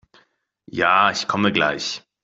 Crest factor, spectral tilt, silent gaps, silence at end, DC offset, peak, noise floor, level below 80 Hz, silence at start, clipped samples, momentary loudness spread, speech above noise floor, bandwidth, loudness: 20 dB; -3.5 dB/octave; none; 0.25 s; under 0.1%; -2 dBFS; -62 dBFS; -60 dBFS; 0.75 s; under 0.1%; 11 LU; 43 dB; 8 kHz; -19 LUFS